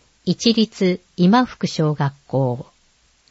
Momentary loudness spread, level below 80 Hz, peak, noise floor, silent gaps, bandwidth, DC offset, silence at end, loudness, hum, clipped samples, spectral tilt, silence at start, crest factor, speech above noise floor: 8 LU; -58 dBFS; -2 dBFS; -59 dBFS; none; 8 kHz; under 0.1%; 0.7 s; -19 LUFS; none; under 0.1%; -6 dB/octave; 0.25 s; 18 dB; 40 dB